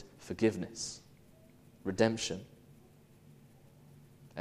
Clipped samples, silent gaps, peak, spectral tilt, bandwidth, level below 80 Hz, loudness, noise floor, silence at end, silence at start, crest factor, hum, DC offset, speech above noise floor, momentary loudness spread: under 0.1%; none; -14 dBFS; -4.5 dB/octave; 15 kHz; -66 dBFS; -35 LUFS; -60 dBFS; 0 s; 0 s; 24 dB; none; under 0.1%; 27 dB; 18 LU